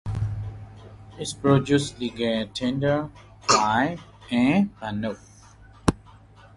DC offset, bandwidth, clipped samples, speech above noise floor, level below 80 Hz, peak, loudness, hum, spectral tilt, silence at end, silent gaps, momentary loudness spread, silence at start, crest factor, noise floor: under 0.1%; 11.5 kHz; under 0.1%; 26 dB; -44 dBFS; -2 dBFS; -24 LUFS; none; -5 dB/octave; 0.6 s; none; 18 LU; 0.05 s; 22 dB; -50 dBFS